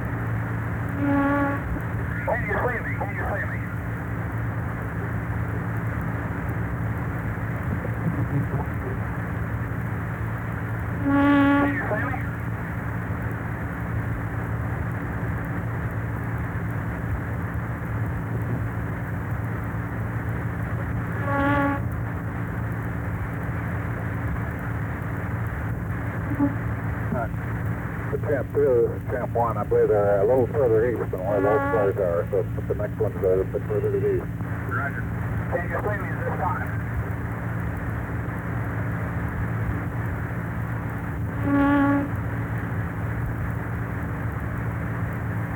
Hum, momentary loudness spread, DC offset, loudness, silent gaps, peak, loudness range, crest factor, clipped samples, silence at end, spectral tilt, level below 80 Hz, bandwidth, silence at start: none; 8 LU; under 0.1%; -26 LUFS; none; -8 dBFS; 6 LU; 18 dB; under 0.1%; 0 s; -9 dB/octave; -38 dBFS; 19 kHz; 0 s